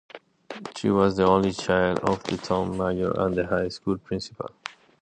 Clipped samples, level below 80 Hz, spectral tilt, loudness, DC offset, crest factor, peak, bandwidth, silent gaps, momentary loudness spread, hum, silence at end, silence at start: under 0.1%; -50 dBFS; -6 dB/octave; -25 LUFS; under 0.1%; 20 dB; -6 dBFS; 9.6 kHz; none; 16 LU; none; 0.3 s; 0.15 s